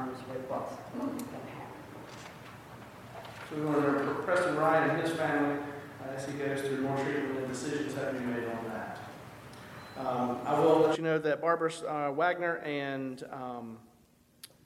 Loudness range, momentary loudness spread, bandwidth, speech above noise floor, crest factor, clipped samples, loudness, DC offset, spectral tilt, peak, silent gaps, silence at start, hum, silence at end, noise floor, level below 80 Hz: 7 LU; 20 LU; 16.5 kHz; 33 dB; 20 dB; under 0.1%; -32 LUFS; under 0.1%; -6 dB/octave; -12 dBFS; none; 0 s; none; 0.2 s; -64 dBFS; -68 dBFS